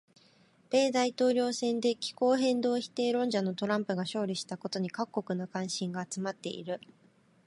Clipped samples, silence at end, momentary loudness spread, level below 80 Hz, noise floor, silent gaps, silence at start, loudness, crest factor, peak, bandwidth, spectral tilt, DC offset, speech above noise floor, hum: under 0.1%; 0.7 s; 9 LU; -80 dBFS; -64 dBFS; none; 0.7 s; -31 LUFS; 16 dB; -16 dBFS; 11.5 kHz; -4.5 dB/octave; under 0.1%; 33 dB; none